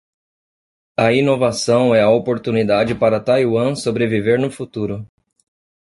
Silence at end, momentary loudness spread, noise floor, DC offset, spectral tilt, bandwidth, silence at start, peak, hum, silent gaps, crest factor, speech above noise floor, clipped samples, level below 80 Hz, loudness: 0.8 s; 11 LU; under -90 dBFS; under 0.1%; -6 dB/octave; 11.5 kHz; 1 s; -2 dBFS; none; none; 16 dB; over 74 dB; under 0.1%; -52 dBFS; -17 LUFS